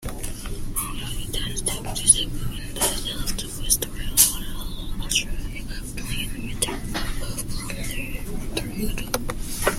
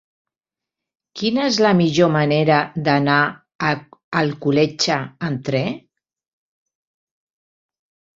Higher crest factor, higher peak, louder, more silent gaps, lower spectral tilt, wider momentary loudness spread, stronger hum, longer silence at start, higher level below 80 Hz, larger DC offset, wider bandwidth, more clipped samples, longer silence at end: first, 26 dB vs 20 dB; about the same, 0 dBFS vs -2 dBFS; second, -25 LUFS vs -19 LUFS; second, none vs 3.55-3.59 s, 4.04-4.12 s; second, -2 dB/octave vs -5.5 dB/octave; first, 16 LU vs 10 LU; neither; second, 0 s vs 1.15 s; first, -32 dBFS vs -60 dBFS; neither; first, 16.5 kHz vs 7.8 kHz; neither; second, 0 s vs 2.4 s